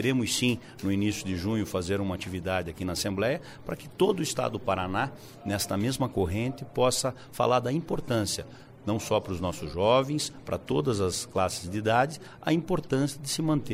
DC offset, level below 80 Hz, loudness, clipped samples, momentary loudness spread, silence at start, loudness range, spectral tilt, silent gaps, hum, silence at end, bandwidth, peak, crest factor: under 0.1%; -52 dBFS; -29 LUFS; under 0.1%; 8 LU; 0 s; 2 LU; -5 dB/octave; none; none; 0 s; 16 kHz; -10 dBFS; 18 dB